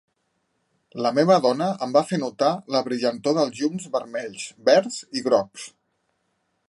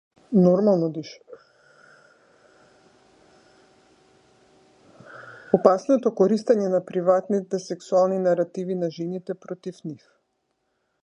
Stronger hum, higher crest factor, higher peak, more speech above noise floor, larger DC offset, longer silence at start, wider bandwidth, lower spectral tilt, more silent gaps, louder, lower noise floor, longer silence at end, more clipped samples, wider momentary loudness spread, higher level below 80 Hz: neither; about the same, 20 dB vs 24 dB; about the same, -4 dBFS vs -2 dBFS; about the same, 50 dB vs 52 dB; neither; first, 0.95 s vs 0.3 s; first, 11.5 kHz vs 9.6 kHz; second, -5 dB/octave vs -8 dB/octave; neither; about the same, -22 LUFS vs -22 LUFS; about the same, -73 dBFS vs -74 dBFS; about the same, 1 s vs 1.1 s; neither; second, 13 LU vs 19 LU; about the same, -74 dBFS vs -72 dBFS